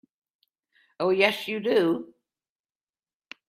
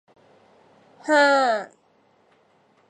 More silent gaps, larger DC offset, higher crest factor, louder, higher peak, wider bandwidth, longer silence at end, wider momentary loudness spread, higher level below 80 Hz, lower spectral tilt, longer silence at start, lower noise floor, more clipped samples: neither; neither; first, 24 dB vs 18 dB; second, -25 LUFS vs -19 LUFS; about the same, -6 dBFS vs -6 dBFS; first, 15.5 kHz vs 11 kHz; first, 1.45 s vs 1.25 s; second, 7 LU vs 20 LU; first, -74 dBFS vs -84 dBFS; first, -5 dB/octave vs -2 dB/octave; about the same, 1 s vs 1.05 s; first, under -90 dBFS vs -61 dBFS; neither